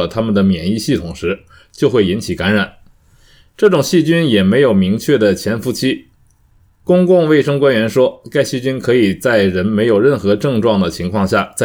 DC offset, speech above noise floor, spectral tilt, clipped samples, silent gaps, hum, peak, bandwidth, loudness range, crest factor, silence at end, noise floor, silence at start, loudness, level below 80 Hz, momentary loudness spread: under 0.1%; 38 dB; -6 dB/octave; under 0.1%; none; none; -2 dBFS; 19 kHz; 3 LU; 12 dB; 0 s; -51 dBFS; 0 s; -14 LUFS; -44 dBFS; 7 LU